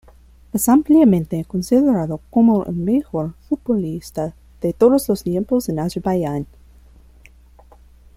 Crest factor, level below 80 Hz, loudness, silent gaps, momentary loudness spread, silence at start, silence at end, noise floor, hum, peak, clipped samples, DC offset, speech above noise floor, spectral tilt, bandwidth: 16 dB; -46 dBFS; -18 LUFS; none; 13 LU; 0.55 s; 1.7 s; -47 dBFS; none; -2 dBFS; under 0.1%; under 0.1%; 30 dB; -7 dB/octave; 16.5 kHz